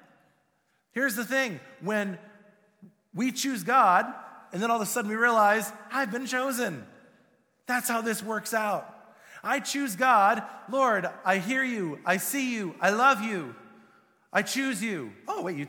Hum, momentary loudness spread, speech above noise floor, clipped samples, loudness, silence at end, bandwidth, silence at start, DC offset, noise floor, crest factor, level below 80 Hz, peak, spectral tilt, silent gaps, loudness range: none; 14 LU; 45 dB; under 0.1%; -27 LUFS; 0 s; 19.5 kHz; 0.95 s; under 0.1%; -72 dBFS; 20 dB; -80 dBFS; -8 dBFS; -3.5 dB/octave; none; 6 LU